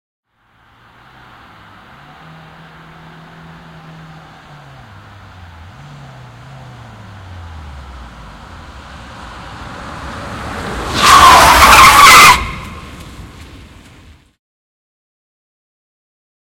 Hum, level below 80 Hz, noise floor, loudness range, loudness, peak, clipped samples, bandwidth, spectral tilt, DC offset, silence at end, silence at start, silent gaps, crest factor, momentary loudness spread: none; -32 dBFS; -52 dBFS; 25 LU; -5 LUFS; 0 dBFS; 0.9%; over 20 kHz; -1.5 dB/octave; under 0.1%; 3.7 s; 7.65 s; none; 14 dB; 30 LU